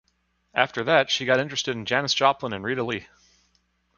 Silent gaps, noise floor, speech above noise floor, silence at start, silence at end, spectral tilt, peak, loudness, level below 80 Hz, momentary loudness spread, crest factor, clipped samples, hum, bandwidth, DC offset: none; -70 dBFS; 46 dB; 0.55 s; 0.9 s; -3.5 dB/octave; -2 dBFS; -24 LUFS; -62 dBFS; 9 LU; 24 dB; under 0.1%; none; 7.2 kHz; under 0.1%